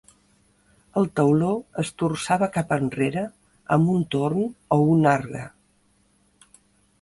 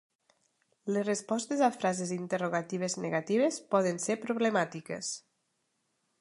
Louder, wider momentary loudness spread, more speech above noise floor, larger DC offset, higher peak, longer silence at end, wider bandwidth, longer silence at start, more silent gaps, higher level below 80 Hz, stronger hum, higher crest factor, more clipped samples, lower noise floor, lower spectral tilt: first, -23 LUFS vs -31 LUFS; first, 12 LU vs 8 LU; second, 41 dB vs 48 dB; neither; first, -4 dBFS vs -12 dBFS; first, 1.55 s vs 1 s; about the same, 11.5 kHz vs 11.5 kHz; about the same, 0.95 s vs 0.85 s; neither; first, -58 dBFS vs -82 dBFS; neither; about the same, 18 dB vs 20 dB; neither; second, -63 dBFS vs -78 dBFS; first, -7 dB/octave vs -4.5 dB/octave